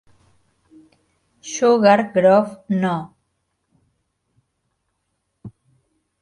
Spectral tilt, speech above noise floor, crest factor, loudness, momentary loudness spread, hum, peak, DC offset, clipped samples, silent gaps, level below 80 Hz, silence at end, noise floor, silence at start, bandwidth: -5.5 dB/octave; 57 dB; 22 dB; -17 LUFS; 17 LU; none; 0 dBFS; under 0.1%; under 0.1%; none; -66 dBFS; 0.75 s; -73 dBFS; 1.45 s; 11.5 kHz